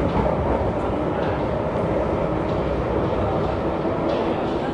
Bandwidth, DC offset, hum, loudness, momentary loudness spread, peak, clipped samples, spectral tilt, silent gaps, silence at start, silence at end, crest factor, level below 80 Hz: 10.5 kHz; under 0.1%; none; -23 LUFS; 2 LU; -8 dBFS; under 0.1%; -8.5 dB/octave; none; 0 s; 0 s; 14 dB; -34 dBFS